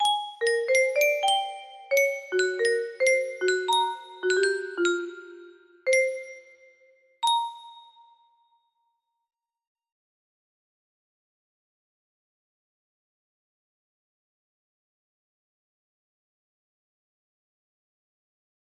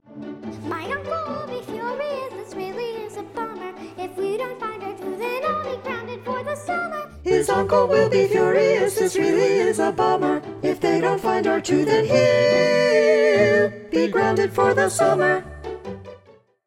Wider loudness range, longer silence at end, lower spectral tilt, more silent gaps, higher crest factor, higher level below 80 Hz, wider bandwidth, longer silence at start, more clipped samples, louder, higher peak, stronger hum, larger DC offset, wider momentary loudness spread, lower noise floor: about the same, 10 LU vs 11 LU; first, 10.95 s vs 0.5 s; second, 0 dB/octave vs -5 dB/octave; neither; about the same, 20 dB vs 16 dB; second, -80 dBFS vs -54 dBFS; about the same, 15.5 kHz vs 16 kHz; about the same, 0 s vs 0.1 s; neither; second, -25 LUFS vs -21 LUFS; second, -10 dBFS vs -4 dBFS; neither; neither; about the same, 14 LU vs 16 LU; first, -77 dBFS vs -52 dBFS